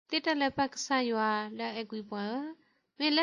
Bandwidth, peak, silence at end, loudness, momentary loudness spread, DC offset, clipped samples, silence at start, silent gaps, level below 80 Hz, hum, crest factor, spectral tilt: 11 kHz; -16 dBFS; 0 s; -32 LUFS; 10 LU; under 0.1%; under 0.1%; 0.1 s; none; -70 dBFS; none; 16 dB; -3 dB/octave